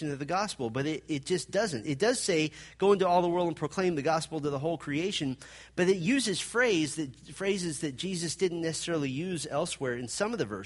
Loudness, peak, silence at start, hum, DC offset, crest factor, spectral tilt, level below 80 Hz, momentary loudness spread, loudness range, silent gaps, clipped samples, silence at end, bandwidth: -30 LUFS; -12 dBFS; 0 s; none; under 0.1%; 18 dB; -4.5 dB/octave; -62 dBFS; 8 LU; 3 LU; none; under 0.1%; 0 s; 11.5 kHz